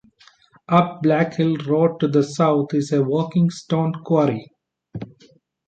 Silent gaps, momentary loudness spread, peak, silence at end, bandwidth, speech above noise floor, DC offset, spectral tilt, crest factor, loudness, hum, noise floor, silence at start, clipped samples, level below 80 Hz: none; 16 LU; -2 dBFS; 0.6 s; 8.8 kHz; 34 dB; under 0.1%; -7.5 dB/octave; 18 dB; -20 LUFS; none; -53 dBFS; 0.7 s; under 0.1%; -62 dBFS